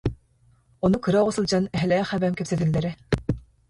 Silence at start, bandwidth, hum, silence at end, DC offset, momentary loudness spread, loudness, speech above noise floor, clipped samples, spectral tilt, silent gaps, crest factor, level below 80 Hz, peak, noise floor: 0.05 s; 11.5 kHz; none; 0.3 s; under 0.1%; 6 LU; -24 LUFS; 38 dB; under 0.1%; -6.5 dB/octave; none; 16 dB; -44 dBFS; -8 dBFS; -60 dBFS